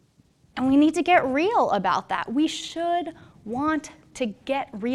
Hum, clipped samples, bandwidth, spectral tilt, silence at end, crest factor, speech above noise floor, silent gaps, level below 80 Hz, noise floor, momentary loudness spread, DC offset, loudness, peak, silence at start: none; under 0.1%; 11.5 kHz; -4.5 dB/octave; 0 s; 18 dB; 37 dB; none; -58 dBFS; -60 dBFS; 13 LU; under 0.1%; -24 LUFS; -6 dBFS; 0.55 s